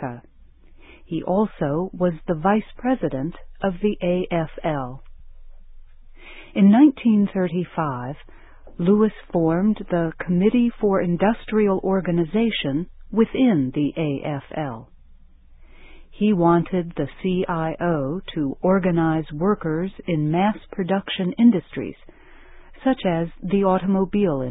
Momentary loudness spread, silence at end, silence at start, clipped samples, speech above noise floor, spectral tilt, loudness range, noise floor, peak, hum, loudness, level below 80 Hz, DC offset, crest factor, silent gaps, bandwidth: 11 LU; 0 s; 0 s; under 0.1%; 28 dB; -12 dB/octave; 4 LU; -48 dBFS; -4 dBFS; none; -22 LUFS; -46 dBFS; under 0.1%; 18 dB; none; 4 kHz